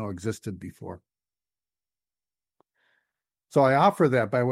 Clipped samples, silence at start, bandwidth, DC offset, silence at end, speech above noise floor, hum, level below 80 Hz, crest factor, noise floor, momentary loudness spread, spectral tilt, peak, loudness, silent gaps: under 0.1%; 0 s; 15 kHz; under 0.1%; 0 s; over 66 dB; none; -68 dBFS; 20 dB; under -90 dBFS; 20 LU; -7 dB/octave; -8 dBFS; -23 LUFS; none